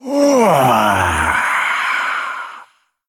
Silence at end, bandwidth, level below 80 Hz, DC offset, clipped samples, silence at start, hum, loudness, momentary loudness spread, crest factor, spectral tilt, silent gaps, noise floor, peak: 0.45 s; 17.5 kHz; -42 dBFS; under 0.1%; under 0.1%; 0.05 s; none; -14 LUFS; 12 LU; 14 dB; -4.5 dB/octave; none; -45 dBFS; -2 dBFS